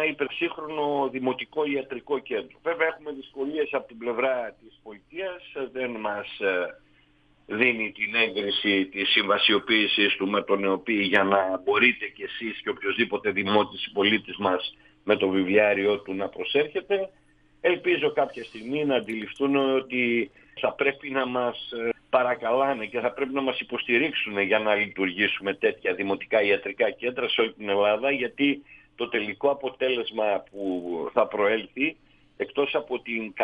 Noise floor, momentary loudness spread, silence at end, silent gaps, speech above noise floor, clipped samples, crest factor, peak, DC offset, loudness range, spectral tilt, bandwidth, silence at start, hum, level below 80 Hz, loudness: -61 dBFS; 10 LU; 0 s; none; 35 dB; under 0.1%; 20 dB; -6 dBFS; under 0.1%; 7 LU; -6.5 dB/octave; 5.2 kHz; 0 s; none; -66 dBFS; -25 LUFS